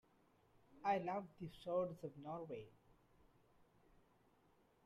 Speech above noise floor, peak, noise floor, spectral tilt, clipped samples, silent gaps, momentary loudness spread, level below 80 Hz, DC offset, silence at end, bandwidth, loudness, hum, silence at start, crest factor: 30 dB; -28 dBFS; -75 dBFS; -7.5 dB/octave; under 0.1%; none; 13 LU; -78 dBFS; under 0.1%; 2.15 s; 13.5 kHz; -46 LUFS; none; 0.7 s; 20 dB